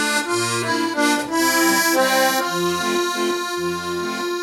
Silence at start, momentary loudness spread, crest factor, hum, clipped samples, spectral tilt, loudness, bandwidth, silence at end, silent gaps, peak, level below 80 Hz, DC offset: 0 s; 8 LU; 14 dB; none; under 0.1%; -2.5 dB/octave; -19 LUFS; 18 kHz; 0 s; none; -4 dBFS; -62 dBFS; under 0.1%